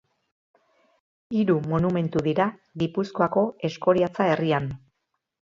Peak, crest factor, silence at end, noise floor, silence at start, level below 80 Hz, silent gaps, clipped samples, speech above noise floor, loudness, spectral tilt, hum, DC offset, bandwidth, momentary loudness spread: -6 dBFS; 18 dB; 0.85 s; -79 dBFS; 1.3 s; -56 dBFS; none; under 0.1%; 55 dB; -24 LUFS; -8 dB/octave; none; under 0.1%; 7.6 kHz; 7 LU